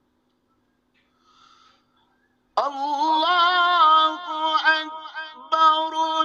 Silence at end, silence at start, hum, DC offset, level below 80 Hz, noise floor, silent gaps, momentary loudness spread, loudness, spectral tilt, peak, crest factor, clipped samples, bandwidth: 0 s; 2.55 s; none; under 0.1%; -78 dBFS; -68 dBFS; none; 15 LU; -19 LUFS; 0 dB/octave; -6 dBFS; 18 dB; under 0.1%; 7.6 kHz